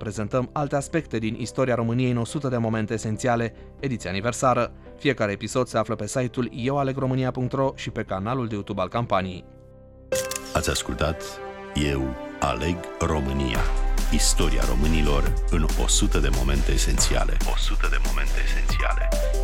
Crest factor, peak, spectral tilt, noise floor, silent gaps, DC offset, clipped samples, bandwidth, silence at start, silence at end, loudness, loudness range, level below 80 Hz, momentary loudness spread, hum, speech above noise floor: 16 dB; -8 dBFS; -4.5 dB/octave; -47 dBFS; none; under 0.1%; under 0.1%; 16.5 kHz; 0 s; 0 s; -25 LUFS; 4 LU; -26 dBFS; 6 LU; none; 24 dB